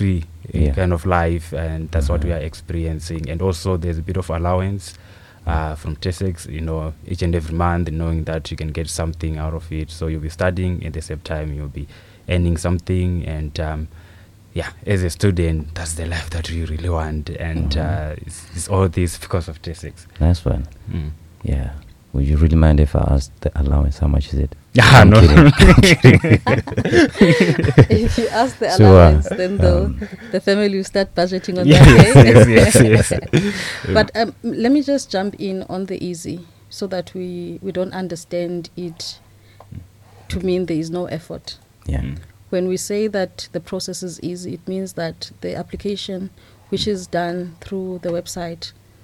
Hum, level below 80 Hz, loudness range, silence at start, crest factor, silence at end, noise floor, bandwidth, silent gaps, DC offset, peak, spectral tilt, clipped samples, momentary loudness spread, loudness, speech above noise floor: none; -26 dBFS; 15 LU; 0 s; 16 dB; 0.35 s; -44 dBFS; 14 kHz; none; under 0.1%; 0 dBFS; -6 dB/octave; 0.6%; 20 LU; -16 LUFS; 29 dB